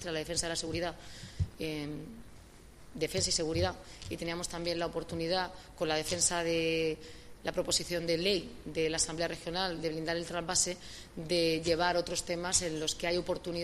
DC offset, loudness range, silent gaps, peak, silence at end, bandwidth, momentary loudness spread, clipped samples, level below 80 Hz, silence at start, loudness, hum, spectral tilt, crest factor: under 0.1%; 4 LU; none; -14 dBFS; 0 s; 15 kHz; 13 LU; under 0.1%; -52 dBFS; 0 s; -33 LUFS; none; -3 dB/octave; 20 dB